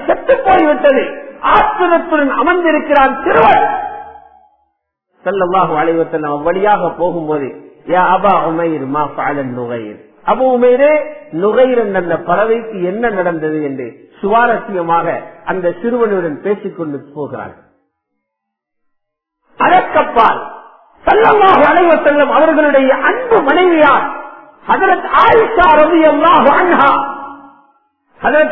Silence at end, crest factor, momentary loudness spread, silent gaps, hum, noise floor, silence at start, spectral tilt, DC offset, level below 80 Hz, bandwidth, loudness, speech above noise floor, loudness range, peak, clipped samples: 0 s; 12 dB; 14 LU; none; none; -76 dBFS; 0 s; -8 dB/octave; 2%; -42 dBFS; 6 kHz; -11 LUFS; 65 dB; 8 LU; 0 dBFS; under 0.1%